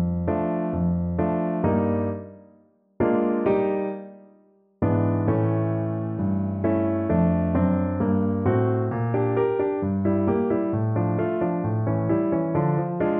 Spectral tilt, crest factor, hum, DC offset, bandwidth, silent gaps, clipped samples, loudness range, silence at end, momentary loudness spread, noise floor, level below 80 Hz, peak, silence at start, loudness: -13 dB/octave; 14 dB; none; under 0.1%; 3.8 kHz; none; under 0.1%; 3 LU; 0 s; 4 LU; -58 dBFS; -48 dBFS; -10 dBFS; 0 s; -24 LUFS